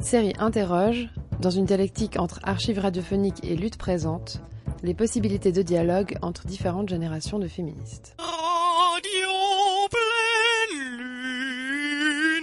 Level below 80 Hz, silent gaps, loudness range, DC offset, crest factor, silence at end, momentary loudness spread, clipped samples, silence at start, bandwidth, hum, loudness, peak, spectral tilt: -44 dBFS; none; 5 LU; under 0.1%; 16 dB; 0 s; 11 LU; under 0.1%; 0 s; 11.5 kHz; none; -25 LUFS; -8 dBFS; -4.5 dB/octave